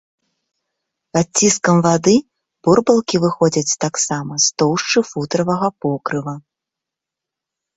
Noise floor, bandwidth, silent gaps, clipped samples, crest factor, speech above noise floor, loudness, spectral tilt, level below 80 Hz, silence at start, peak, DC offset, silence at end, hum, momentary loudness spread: -84 dBFS; 8.2 kHz; none; under 0.1%; 16 dB; 68 dB; -16 LUFS; -4 dB/octave; -54 dBFS; 1.15 s; -2 dBFS; under 0.1%; 1.35 s; none; 9 LU